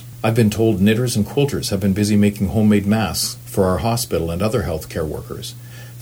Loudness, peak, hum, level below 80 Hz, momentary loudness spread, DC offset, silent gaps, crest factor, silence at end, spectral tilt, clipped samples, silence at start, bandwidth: -18 LUFS; -2 dBFS; none; -40 dBFS; 11 LU; under 0.1%; none; 16 dB; 0 s; -5.5 dB/octave; under 0.1%; 0 s; over 20 kHz